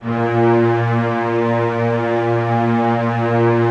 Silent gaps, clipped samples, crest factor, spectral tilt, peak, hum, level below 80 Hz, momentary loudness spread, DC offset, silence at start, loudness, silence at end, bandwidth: none; under 0.1%; 12 dB; -9 dB/octave; -4 dBFS; none; -56 dBFS; 3 LU; under 0.1%; 0 s; -17 LUFS; 0 s; 7 kHz